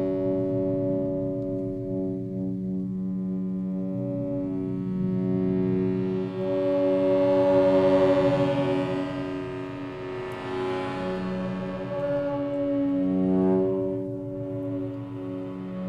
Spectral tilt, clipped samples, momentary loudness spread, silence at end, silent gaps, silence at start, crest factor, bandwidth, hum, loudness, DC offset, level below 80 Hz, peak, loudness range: -9 dB/octave; under 0.1%; 12 LU; 0 s; none; 0 s; 16 dB; 7.6 kHz; none; -27 LUFS; under 0.1%; -52 dBFS; -10 dBFS; 7 LU